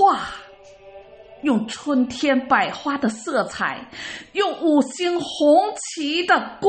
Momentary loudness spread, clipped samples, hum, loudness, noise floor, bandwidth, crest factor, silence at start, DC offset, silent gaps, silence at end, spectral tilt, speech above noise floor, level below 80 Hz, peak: 10 LU; under 0.1%; none; -21 LUFS; -45 dBFS; 8.8 kHz; 18 dB; 0 s; under 0.1%; none; 0 s; -3.5 dB/octave; 24 dB; -60 dBFS; -4 dBFS